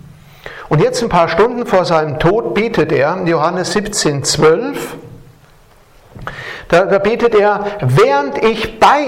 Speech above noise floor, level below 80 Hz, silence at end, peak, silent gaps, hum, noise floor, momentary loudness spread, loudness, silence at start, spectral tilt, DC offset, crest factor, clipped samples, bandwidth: 32 dB; -40 dBFS; 0 s; 0 dBFS; none; none; -45 dBFS; 15 LU; -13 LUFS; 0.45 s; -5 dB/octave; under 0.1%; 14 dB; under 0.1%; 16 kHz